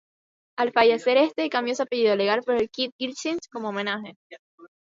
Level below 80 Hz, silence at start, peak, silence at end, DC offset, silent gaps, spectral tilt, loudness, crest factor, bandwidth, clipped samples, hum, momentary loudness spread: -68 dBFS; 0.6 s; -6 dBFS; 0.2 s; under 0.1%; 2.92-2.99 s, 4.16-4.30 s, 4.39-4.58 s; -3.5 dB/octave; -24 LUFS; 20 dB; 7.8 kHz; under 0.1%; none; 11 LU